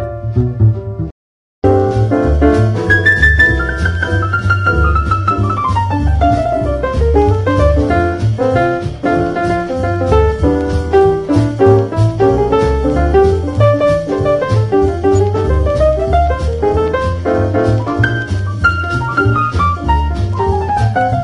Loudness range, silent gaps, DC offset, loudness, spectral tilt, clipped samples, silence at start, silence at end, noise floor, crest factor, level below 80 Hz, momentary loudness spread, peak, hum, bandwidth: 3 LU; 1.11-1.62 s; under 0.1%; -13 LUFS; -7.5 dB/octave; under 0.1%; 0 s; 0 s; under -90 dBFS; 12 dB; -22 dBFS; 5 LU; 0 dBFS; none; 11 kHz